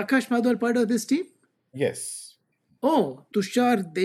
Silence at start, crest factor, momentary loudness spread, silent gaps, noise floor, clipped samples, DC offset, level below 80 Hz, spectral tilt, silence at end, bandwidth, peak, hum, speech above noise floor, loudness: 0 s; 16 dB; 12 LU; none; -65 dBFS; under 0.1%; under 0.1%; -80 dBFS; -5 dB/octave; 0 s; 13.5 kHz; -10 dBFS; none; 42 dB; -25 LUFS